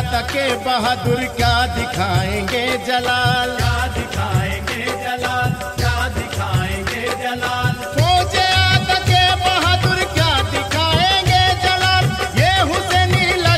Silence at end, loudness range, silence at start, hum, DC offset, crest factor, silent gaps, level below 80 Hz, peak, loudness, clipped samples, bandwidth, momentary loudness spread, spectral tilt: 0 s; 6 LU; 0 s; none; under 0.1%; 16 dB; none; -30 dBFS; 0 dBFS; -17 LUFS; under 0.1%; 16 kHz; 8 LU; -4 dB/octave